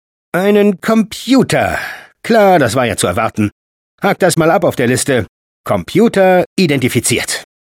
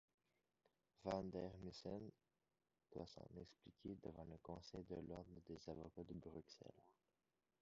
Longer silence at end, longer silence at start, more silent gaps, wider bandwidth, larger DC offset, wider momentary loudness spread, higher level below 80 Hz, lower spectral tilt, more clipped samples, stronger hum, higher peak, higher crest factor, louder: second, 0.25 s vs 0.7 s; second, 0.35 s vs 1 s; first, 3.52-3.98 s, 5.29-5.64 s, 6.46-6.56 s vs none; first, 17 kHz vs 7.4 kHz; neither; about the same, 10 LU vs 12 LU; first, -46 dBFS vs -72 dBFS; second, -5 dB/octave vs -6.5 dB/octave; neither; neither; first, 0 dBFS vs -32 dBFS; second, 12 dB vs 24 dB; first, -13 LUFS vs -55 LUFS